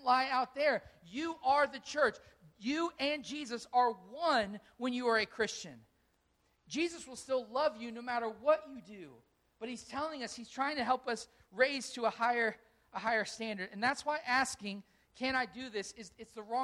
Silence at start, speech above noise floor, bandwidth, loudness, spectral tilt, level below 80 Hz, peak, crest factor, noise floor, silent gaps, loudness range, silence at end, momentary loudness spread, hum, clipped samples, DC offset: 0 s; 40 dB; 13.5 kHz; -35 LUFS; -3 dB/octave; -72 dBFS; -16 dBFS; 20 dB; -75 dBFS; none; 3 LU; 0 s; 15 LU; none; under 0.1%; under 0.1%